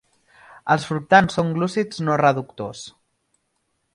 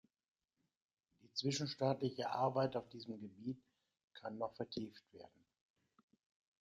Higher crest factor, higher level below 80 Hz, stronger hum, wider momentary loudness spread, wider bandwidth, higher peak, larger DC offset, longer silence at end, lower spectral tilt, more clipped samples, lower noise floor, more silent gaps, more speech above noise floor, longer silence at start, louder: about the same, 22 dB vs 22 dB; first, -56 dBFS vs -82 dBFS; neither; about the same, 17 LU vs 16 LU; first, 11.5 kHz vs 9.6 kHz; first, 0 dBFS vs -22 dBFS; neither; second, 1.05 s vs 1.35 s; about the same, -6 dB/octave vs -5.5 dB/octave; neither; second, -72 dBFS vs -88 dBFS; second, none vs 4.04-4.08 s; first, 52 dB vs 46 dB; second, 0.65 s vs 1.25 s; first, -20 LUFS vs -42 LUFS